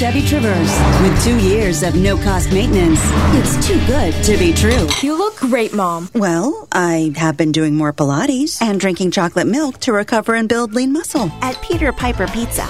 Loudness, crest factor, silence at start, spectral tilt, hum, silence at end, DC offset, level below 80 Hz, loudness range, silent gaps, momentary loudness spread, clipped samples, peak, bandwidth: -15 LUFS; 14 dB; 0 s; -5 dB/octave; none; 0 s; 0.4%; -24 dBFS; 3 LU; none; 5 LU; under 0.1%; 0 dBFS; 16 kHz